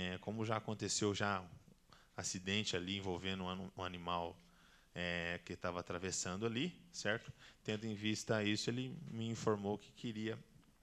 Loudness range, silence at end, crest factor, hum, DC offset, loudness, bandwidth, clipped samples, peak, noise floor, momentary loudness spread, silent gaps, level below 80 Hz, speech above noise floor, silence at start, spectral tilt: 2 LU; 0.2 s; 22 dB; none; under 0.1%; -41 LUFS; 13 kHz; under 0.1%; -20 dBFS; -67 dBFS; 8 LU; none; -70 dBFS; 25 dB; 0 s; -4 dB/octave